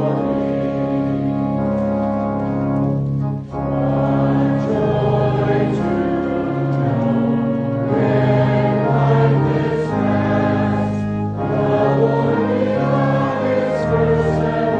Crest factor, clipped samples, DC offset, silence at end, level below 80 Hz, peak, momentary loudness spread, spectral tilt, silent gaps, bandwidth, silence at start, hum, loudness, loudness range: 14 dB; under 0.1%; under 0.1%; 0 s; -40 dBFS; -4 dBFS; 5 LU; -9.5 dB/octave; none; 7.4 kHz; 0 s; none; -18 LUFS; 3 LU